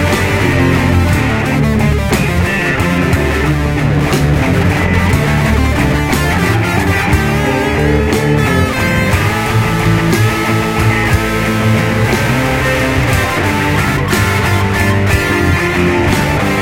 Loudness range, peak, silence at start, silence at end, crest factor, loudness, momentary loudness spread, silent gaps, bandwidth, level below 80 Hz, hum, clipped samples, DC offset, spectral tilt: 0 LU; 0 dBFS; 0 s; 0 s; 12 dB; -12 LUFS; 2 LU; none; 16 kHz; -22 dBFS; none; under 0.1%; under 0.1%; -5.5 dB/octave